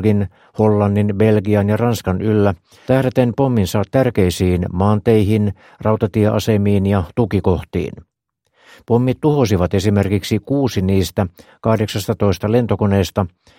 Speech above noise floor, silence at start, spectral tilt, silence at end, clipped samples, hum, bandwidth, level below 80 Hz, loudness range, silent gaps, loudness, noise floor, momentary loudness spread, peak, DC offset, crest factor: 53 dB; 0 s; -7.5 dB/octave; 0.3 s; under 0.1%; none; 16.5 kHz; -40 dBFS; 2 LU; none; -17 LUFS; -69 dBFS; 6 LU; 0 dBFS; under 0.1%; 16 dB